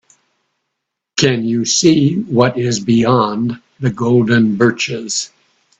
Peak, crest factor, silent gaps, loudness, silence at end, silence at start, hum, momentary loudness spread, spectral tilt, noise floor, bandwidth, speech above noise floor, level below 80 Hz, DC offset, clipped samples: 0 dBFS; 16 dB; none; -14 LUFS; 0.55 s; 1.15 s; none; 9 LU; -4.5 dB/octave; -77 dBFS; 8.4 kHz; 63 dB; -52 dBFS; under 0.1%; under 0.1%